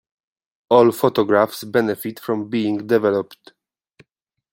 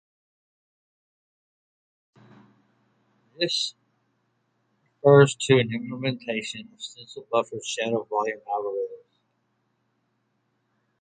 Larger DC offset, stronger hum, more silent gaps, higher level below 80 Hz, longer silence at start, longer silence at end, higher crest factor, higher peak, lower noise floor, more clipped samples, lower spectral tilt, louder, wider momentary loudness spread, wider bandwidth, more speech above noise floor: neither; neither; neither; first, -64 dBFS vs -70 dBFS; second, 0.7 s vs 3.4 s; second, 1.2 s vs 2.05 s; second, 18 dB vs 24 dB; about the same, -2 dBFS vs -4 dBFS; about the same, -74 dBFS vs -73 dBFS; neither; about the same, -6 dB/octave vs -5 dB/octave; first, -19 LUFS vs -24 LUFS; second, 10 LU vs 19 LU; first, 16.5 kHz vs 9.4 kHz; first, 55 dB vs 49 dB